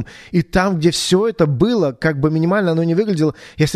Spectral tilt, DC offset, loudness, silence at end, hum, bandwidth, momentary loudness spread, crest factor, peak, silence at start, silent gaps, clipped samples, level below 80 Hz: -6 dB/octave; under 0.1%; -17 LUFS; 0 s; none; 13.5 kHz; 5 LU; 16 dB; 0 dBFS; 0 s; none; under 0.1%; -40 dBFS